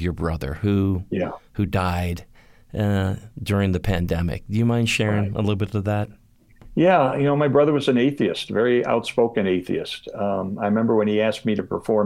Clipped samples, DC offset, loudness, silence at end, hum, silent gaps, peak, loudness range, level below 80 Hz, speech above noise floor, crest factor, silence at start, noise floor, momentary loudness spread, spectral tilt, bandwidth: under 0.1%; under 0.1%; -22 LUFS; 0 s; none; none; -6 dBFS; 5 LU; -42 dBFS; 27 dB; 16 dB; 0 s; -48 dBFS; 9 LU; -7 dB/octave; 16 kHz